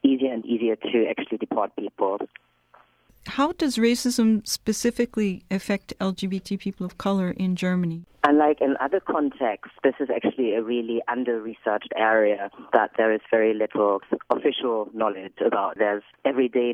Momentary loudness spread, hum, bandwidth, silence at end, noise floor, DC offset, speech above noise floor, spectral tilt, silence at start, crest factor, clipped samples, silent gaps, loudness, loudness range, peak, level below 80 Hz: 8 LU; none; 15.5 kHz; 0 s; -58 dBFS; under 0.1%; 34 dB; -5.5 dB/octave; 0.05 s; 20 dB; under 0.1%; none; -24 LUFS; 3 LU; -4 dBFS; -60 dBFS